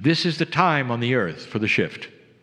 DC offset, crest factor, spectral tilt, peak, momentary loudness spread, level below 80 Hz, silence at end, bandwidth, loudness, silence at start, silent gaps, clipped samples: under 0.1%; 22 dB; -6 dB/octave; -2 dBFS; 9 LU; -64 dBFS; 0.35 s; 10.5 kHz; -22 LUFS; 0 s; none; under 0.1%